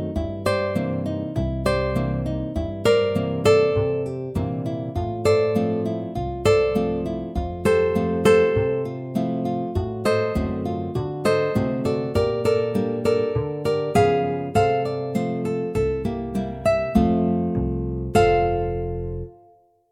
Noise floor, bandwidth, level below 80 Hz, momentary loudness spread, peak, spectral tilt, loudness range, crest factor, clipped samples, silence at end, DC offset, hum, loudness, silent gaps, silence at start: -56 dBFS; 14.5 kHz; -38 dBFS; 9 LU; -2 dBFS; -7 dB/octave; 2 LU; 18 dB; under 0.1%; 0.6 s; under 0.1%; none; -22 LUFS; none; 0 s